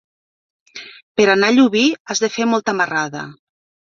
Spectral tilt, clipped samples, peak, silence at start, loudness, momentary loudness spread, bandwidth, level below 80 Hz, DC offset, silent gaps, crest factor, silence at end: -3.5 dB/octave; under 0.1%; -2 dBFS; 0.75 s; -16 LUFS; 22 LU; 7.6 kHz; -62 dBFS; under 0.1%; 1.03-1.15 s, 2.00-2.05 s; 16 dB; 0.6 s